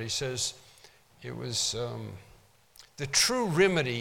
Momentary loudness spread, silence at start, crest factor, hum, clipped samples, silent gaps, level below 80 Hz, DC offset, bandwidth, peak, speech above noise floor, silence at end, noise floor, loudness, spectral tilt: 18 LU; 0 s; 22 dB; none; under 0.1%; none; -60 dBFS; under 0.1%; 18 kHz; -10 dBFS; 29 dB; 0 s; -59 dBFS; -28 LUFS; -3 dB/octave